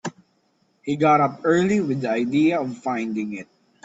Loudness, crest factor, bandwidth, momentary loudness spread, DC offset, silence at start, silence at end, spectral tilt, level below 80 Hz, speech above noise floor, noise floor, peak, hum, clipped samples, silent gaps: -21 LUFS; 16 dB; 8 kHz; 14 LU; under 0.1%; 0.05 s; 0.4 s; -6.5 dB/octave; -64 dBFS; 45 dB; -66 dBFS; -6 dBFS; none; under 0.1%; none